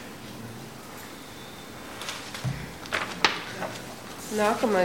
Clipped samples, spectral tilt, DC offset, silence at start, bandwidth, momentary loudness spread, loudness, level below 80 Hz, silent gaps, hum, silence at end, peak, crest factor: under 0.1%; -4 dB/octave; 0.2%; 0 s; 17 kHz; 16 LU; -31 LUFS; -56 dBFS; none; none; 0 s; 0 dBFS; 30 dB